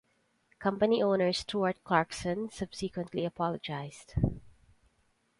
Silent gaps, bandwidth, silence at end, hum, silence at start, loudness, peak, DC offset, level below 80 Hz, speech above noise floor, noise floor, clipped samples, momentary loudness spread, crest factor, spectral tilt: none; 11.5 kHz; 0.9 s; none; 0.6 s; -32 LUFS; -10 dBFS; under 0.1%; -50 dBFS; 42 dB; -73 dBFS; under 0.1%; 11 LU; 22 dB; -6 dB/octave